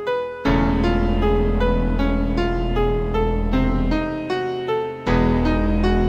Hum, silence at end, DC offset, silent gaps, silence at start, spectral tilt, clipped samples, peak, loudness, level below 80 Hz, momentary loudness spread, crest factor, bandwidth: none; 0 s; under 0.1%; none; 0 s; -8 dB/octave; under 0.1%; -6 dBFS; -21 LUFS; -24 dBFS; 5 LU; 14 dB; 7 kHz